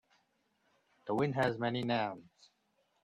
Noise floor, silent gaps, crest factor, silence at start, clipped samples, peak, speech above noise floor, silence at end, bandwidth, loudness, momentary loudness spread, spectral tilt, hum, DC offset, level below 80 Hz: -77 dBFS; none; 20 dB; 1.05 s; under 0.1%; -18 dBFS; 43 dB; 0.8 s; 13 kHz; -34 LUFS; 14 LU; -7 dB/octave; none; under 0.1%; -74 dBFS